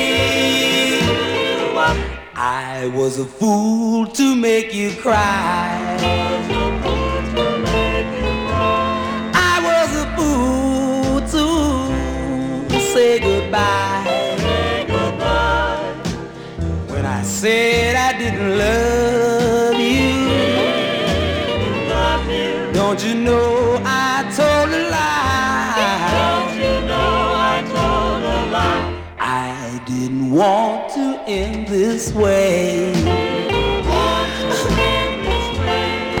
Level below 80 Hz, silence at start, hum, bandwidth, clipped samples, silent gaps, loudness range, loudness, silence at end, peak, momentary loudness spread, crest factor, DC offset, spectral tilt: -30 dBFS; 0 s; none; 19 kHz; under 0.1%; none; 3 LU; -17 LUFS; 0 s; -2 dBFS; 7 LU; 14 dB; under 0.1%; -4.5 dB/octave